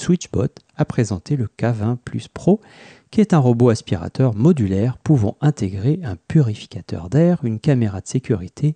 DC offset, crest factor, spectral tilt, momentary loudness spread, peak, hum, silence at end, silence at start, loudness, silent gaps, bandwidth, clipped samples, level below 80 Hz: under 0.1%; 14 dB; -8 dB/octave; 9 LU; -4 dBFS; none; 0 s; 0 s; -19 LUFS; none; 9.4 kHz; under 0.1%; -48 dBFS